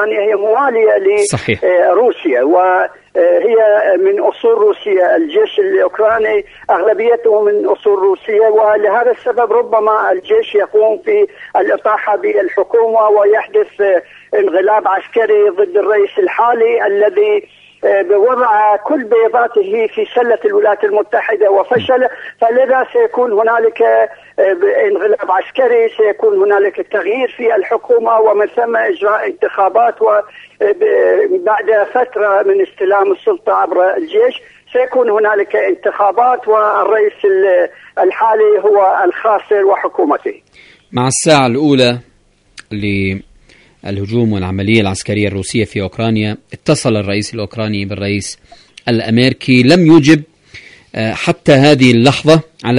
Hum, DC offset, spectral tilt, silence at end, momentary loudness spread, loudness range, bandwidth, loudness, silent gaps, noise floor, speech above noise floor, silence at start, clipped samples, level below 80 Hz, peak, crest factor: none; under 0.1%; -5.5 dB/octave; 0 s; 7 LU; 4 LU; 11 kHz; -12 LUFS; none; -50 dBFS; 38 dB; 0 s; under 0.1%; -52 dBFS; 0 dBFS; 12 dB